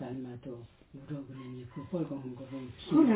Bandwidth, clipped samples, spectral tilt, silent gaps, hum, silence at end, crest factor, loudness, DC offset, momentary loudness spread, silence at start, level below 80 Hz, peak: 4 kHz; under 0.1%; -7.5 dB/octave; none; none; 0 s; 20 dB; -37 LUFS; under 0.1%; 15 LU; 0 s; -64 dBFS; -14 dBFS